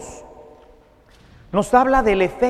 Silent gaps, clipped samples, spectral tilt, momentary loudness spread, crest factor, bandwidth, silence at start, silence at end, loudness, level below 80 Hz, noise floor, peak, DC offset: none; under 0.1%; -5.5 dB/octave; 23 LU; 20 dB; 13.5 kHz; 0 s; 0 s; -17 LUFS; -38 dBFS; -51 dBFS; 0 dBFS; under 0.1%